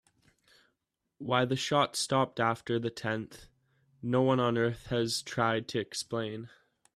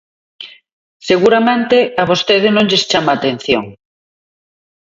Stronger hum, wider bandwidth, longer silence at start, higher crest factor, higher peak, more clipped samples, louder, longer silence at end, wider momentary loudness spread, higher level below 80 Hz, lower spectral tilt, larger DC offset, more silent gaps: neither; first, 14 kHz vs 7.8 kHz; first, 1.2 s vs 0.4 s; first, 20 dB vs 14 dB; second, -12 dBFS vs 0 dBFS; neither; second, -31 LUFS vs -13 LUFS; second, 0.5 s vs 1.1 s; second, 12 LU vs 22 LU; second, -64 dBFS vs -52 dBFS; about the same, -4.5 dB/octave vs -4.5 dB/octave; neither; second, none vs 0.72-1.00 s